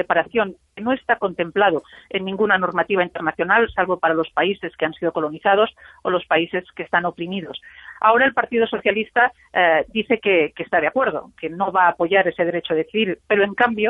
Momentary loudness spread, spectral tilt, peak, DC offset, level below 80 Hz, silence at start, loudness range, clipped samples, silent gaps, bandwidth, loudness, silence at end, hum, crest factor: 10 LU; -7.5 dB/octave; -2 dBFS; under 0.1%; -56 dBFS; 0 s; 2 LU; under 0.1%; none; 3.9 kHz; -20 LUFS; 0 s; none; 18 dB